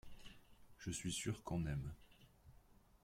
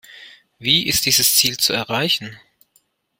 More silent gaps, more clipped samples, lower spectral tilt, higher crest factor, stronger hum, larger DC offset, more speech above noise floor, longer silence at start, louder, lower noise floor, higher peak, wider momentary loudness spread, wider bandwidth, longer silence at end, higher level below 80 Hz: neither; neither; first, -4.5 dB/octave vs -1 dB/octave; about the same, 18 dB vs 20 dB; neither; neither; second, 24 dB vs 44 dB; about the same, 0.05 s vs 0.1 s; second, -45 LUFS vs -16 LUFS; first, -67 dBFS vs -63 dBFS; second, -30 dBFS vs -2 dBFS; first, 20 LU vs 9 LU; about the same, 16.5 kHz vs 16.5 kHz; second, 0.05 s vs 0.8 s; second, -60 dBFS vs -54 dBFS